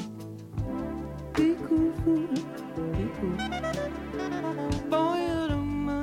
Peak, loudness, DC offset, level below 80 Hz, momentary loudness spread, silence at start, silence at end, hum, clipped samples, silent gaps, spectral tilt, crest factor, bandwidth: -14 dBFS; -30 LUFS; under 0.1%; -44 dBFS; 10 LU; 0 s; 0 s; none; under 0.1%; none; -7 dB/octave; 16 dB; 14.5 kHz